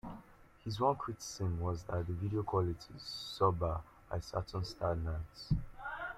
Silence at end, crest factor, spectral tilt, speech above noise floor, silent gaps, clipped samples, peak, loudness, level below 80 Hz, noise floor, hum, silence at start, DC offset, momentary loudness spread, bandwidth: 0 s; 20 dB; -6 dB/octave; 22 dB; none; under 0.1%; -16 dBFS; -38 LUFS; -52 dBFS; -59 dBFS; none; 0.05 s; under 0.1%; 11 LU; 14 kHz